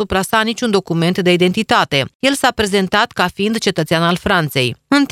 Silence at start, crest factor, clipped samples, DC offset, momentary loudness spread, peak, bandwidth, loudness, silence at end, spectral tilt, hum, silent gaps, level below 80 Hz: 0 s; 16 dB; under 0.1%; under 0.1%; 3 LU; 0 dBFS; 16 kHz; -15 LUFS; 0.05 s; -4.5 dB/octave; none; 2.15-2.20 s; -42 dBFS